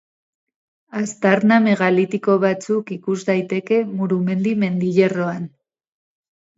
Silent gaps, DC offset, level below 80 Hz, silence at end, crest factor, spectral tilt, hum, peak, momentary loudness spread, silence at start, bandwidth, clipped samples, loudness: none; under 0.1%; -66 dBFS; 1.1 s; 20 dB; -7 dB/octave; none; 0 dBFS; 11 LU; 0.95 s; 8 kHz; under 0.1%; -19 LUFS